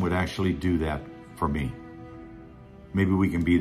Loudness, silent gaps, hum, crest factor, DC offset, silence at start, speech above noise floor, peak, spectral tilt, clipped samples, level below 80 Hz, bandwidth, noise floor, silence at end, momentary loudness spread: -27 LUFS; none; none; 16 dB; under 0.1%; 0 s; 22 dB; -10 dBFS; -7.5 dB/octave; under 0.1%; -44 dBFS; 13.5 kHz; -47 dBFS; 0 s; 22 LU